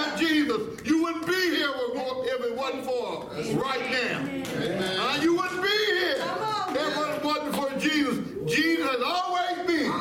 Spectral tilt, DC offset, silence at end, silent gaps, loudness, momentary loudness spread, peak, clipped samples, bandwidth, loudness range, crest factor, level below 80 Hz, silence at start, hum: -4 dB/octave; under 0.1%; 0 s; none; -26 LUFS; 6 LU; -12 dBFS; under 0.1%; 16.5 kHz; 2 LU; 14 dB; -60 dBFS; 0 s; none